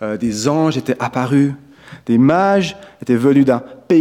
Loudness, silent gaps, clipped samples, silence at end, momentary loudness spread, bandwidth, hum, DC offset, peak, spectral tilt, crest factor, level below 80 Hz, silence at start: -16 LUFS; none; under 0.1%; 0 s; 10 LU; 12.5 kHz; none; under 0.1%; -2 dBFS; -6.5 dB/octave; 14 dB; -54 dBFS; 0 s